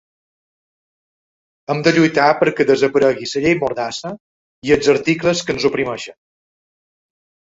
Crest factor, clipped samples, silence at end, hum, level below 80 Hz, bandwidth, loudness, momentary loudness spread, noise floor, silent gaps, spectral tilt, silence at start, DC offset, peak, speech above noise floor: 18 dB; under 0.1%; 1.3 s; none; -52 dBFS; 8 kHz; -16 LUFS; 15 LU; under -90 dBFS; 4.20-4.62 s; -5 dB/octave; 1.7 s; under 0.1%; 0 dBFS; over 74 dB